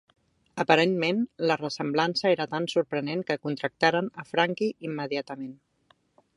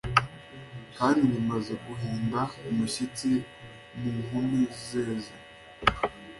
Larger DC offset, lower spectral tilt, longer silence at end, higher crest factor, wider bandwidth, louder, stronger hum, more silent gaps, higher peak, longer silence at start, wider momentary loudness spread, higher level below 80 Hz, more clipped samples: neither; about the same, -5.5 dB/octave vs -5.5 dB/octave; first, 0.8 s vs 0 s; about the same, 24 dB vs 24 dB; about the same, 11.5 kHz vs 11.5 kHz; about the same, -27 LUFS vs -29 LUFS; neither; neither; about the same, -4 dBFS vs -6 dBFS; first, 0.55 s vs 0.05 s; second, 10 LU vs 18 LU; second, -72 dBFS vs -52 dBFS; neither